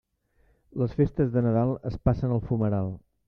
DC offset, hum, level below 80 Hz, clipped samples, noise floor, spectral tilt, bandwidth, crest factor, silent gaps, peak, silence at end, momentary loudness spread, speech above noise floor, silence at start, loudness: under 0.1%; none; -44 dBFS; under 0.1%; -66 dBFS; -11.5 dB/octave; 5.6 kHz; 18 dB; none; -10 dBFS; 0.3 s; 7 LU; 41 dB; 0.75 s; -27 LUFS